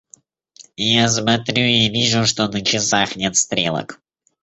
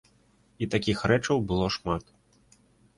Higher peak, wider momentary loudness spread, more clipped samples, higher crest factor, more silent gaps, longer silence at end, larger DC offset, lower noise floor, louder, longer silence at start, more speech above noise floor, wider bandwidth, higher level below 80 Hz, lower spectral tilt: first, -2 dBFS vs -8 dBFS; about the same, 7 LU vs 8 LU; neither; about the same, 18 dB vs 20 dB; neither; second, 0.5 s vs 0.95 s; neither; second, -51 dBFS vs -63 dBFS; first, -17 LUFS vs -27 LUFS; about the same, 0.6 s vs 0.6 s; second, 33 dB vs 37 dB; second, 8.2 kHz vs 11.5 kHz; about the same, -52 dBFS vs -48 dBFS; second, -3 dB/octave vs -5.5 dB/octave